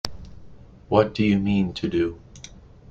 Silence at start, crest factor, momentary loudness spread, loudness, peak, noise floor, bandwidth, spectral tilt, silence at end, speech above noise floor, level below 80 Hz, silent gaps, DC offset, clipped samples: 0.05 s; 22 dB; 23 LU; -23 LUFS; -2 dBFS; -46 dBFS; 8.4 kHz; -6.5 dB/octave; 0.35 s; 24 dB; -46 dBFS; none; under 0.1%; under 0.1%